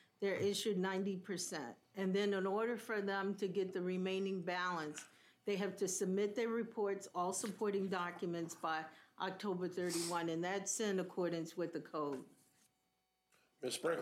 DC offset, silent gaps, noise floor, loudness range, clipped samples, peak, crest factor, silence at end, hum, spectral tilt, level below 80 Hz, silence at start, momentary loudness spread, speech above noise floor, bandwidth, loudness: under 0.1%; none; -83 dBFS; 2 LU; under 0.1%; -26 dBFS; 16 dB; 0 s; none; -4 dB/octave; under -90 dBFS; 0.2 s; 7 LU; 44 dB; 16 kHz; -40 LUFS